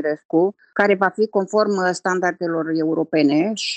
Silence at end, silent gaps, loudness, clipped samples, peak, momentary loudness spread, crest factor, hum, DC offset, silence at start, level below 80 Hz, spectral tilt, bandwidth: 0 s; 0.25-0.29 s; -19 LUFS; under 0.1%; -2 dBFS; 4 LU; 16 dB; none; under 0.1%; 0 s; -70 dBFS; -5 dB/octave; 9 kHz